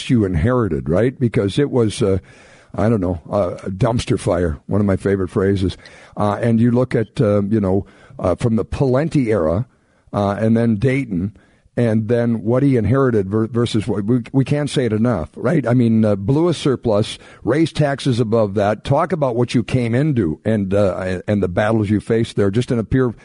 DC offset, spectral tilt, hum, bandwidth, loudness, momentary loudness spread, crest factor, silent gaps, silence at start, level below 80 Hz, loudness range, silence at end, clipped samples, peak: under 0.1%; -7.5 dB/octave; none; 11 kHz; -18 LUFS; 5 LU; 12 dB; none; 0 s; -40 dBFS; 2 LU; 0.1 s; under 0.1%; -6 dBFS